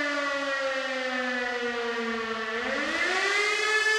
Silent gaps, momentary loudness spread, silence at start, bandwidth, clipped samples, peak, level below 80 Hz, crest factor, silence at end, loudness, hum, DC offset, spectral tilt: none; 6 LU; 0 s; 15 kHz; under 0.1%; -14 dBFS; -64 dBFS; 14 dB; 0 s; -27 LUFS; none; under 0.1%; -1 dB/octave